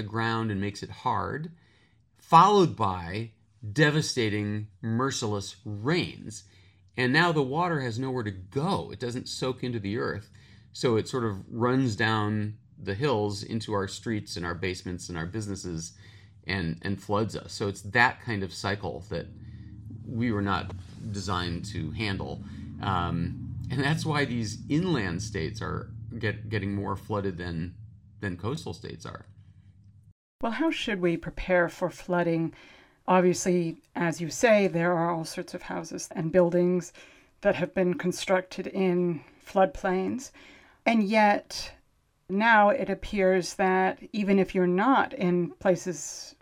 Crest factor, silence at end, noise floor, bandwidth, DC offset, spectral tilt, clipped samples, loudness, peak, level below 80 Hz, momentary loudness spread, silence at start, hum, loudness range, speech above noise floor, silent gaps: 24 dB; 0.1 s; -67 dBFS; 15 kHz; under 0.1%; -5.5 dB/octave; under 0.1%; -28 LUFS; -4 dBFS; -54 dBFS; 14 LU; 0 s; none; 8 LU; 40 dB; 30.12-30.39 s